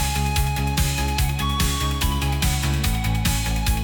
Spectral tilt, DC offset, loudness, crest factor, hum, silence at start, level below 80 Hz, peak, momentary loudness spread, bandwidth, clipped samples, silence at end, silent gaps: -4 dB/octave; under 0.1%; -22 LUFS; 12 dB; none; 0 s; -24 dBFS; -10 dBFS; 1 LU; 19.5 kHz; under 0.1%; 0 s; none